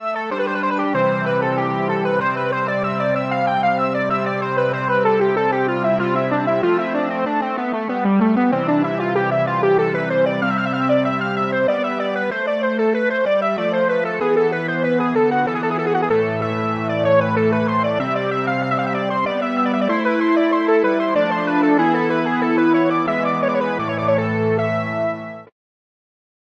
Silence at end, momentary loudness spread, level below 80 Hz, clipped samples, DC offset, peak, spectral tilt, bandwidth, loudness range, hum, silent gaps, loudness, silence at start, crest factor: 1.05 s; 5 LU; -62 dBFS; under 0.1%; under 0.1%; -4 dBFS; -8 dB/octave; 7.8 kHz; 2 LU; none; none; -19 LUFS; 0 s; 14 dB